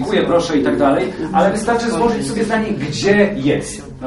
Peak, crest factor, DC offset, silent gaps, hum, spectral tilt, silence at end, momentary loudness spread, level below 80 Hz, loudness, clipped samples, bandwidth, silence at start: 0 dBFS; 16 dB; under 0.1%; none; none; -5.5 dB/octave; 0 s; 5 LU; -40 dBFS; -16 LUFS; under 0.1%; 11.5 kHz; 0 s